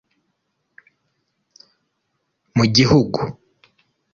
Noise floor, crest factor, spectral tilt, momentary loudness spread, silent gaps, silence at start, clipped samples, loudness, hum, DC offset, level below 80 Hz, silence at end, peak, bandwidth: -73 dBFS; 20 dB; -5.5 dB/octave; 12 LU; none; 2.55 s; under 0.1%; -17 LUFS; none; under 0.1%; -50 dBFS; 0.8 s; -2 dBFS; 7.4 kHz